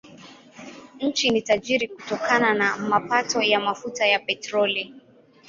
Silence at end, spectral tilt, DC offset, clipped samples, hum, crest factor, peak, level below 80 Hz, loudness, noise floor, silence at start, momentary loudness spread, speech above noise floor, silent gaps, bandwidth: 0.5 s; -3 dB/octave; under 0.1%; under 0.1%; none; 20 dB; -4 dBFS; -66 dBFS; -22 LUFS; -53 dBFS; 0.05 s; 13 LU; 30 dB; none; 7.8 kHz